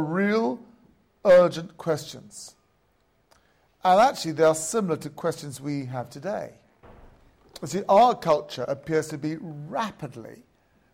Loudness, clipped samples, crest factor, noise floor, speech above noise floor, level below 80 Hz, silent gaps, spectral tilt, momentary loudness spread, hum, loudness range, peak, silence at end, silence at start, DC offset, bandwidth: -24 LUFS; under 0.1%; 18 dB; -67 dBFS; 43 dB; -62 dBFS; none; -5 dB/octave; 21 LU; none; 3 LU; -8 dBFS; 0.65 s; 0 s; under 0.1%; 16 kHz